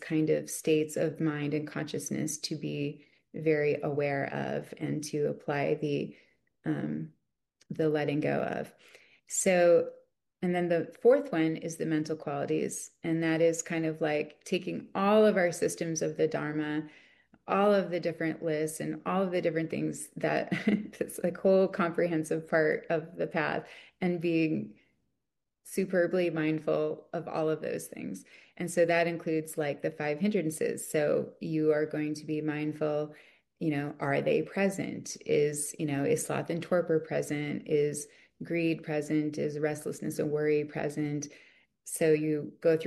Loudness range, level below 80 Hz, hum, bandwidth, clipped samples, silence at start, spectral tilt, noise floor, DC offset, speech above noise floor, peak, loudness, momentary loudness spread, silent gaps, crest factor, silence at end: 4 LU; -74 dBFS; none; 12.5 kHz; under 0.1%; 0 s; -5.5 dB/octave; -87 dBFS; under 0.1%; 57 dB; -14 dBFS; -31 LUFS; 10 LU; none; 18 dB; 0 s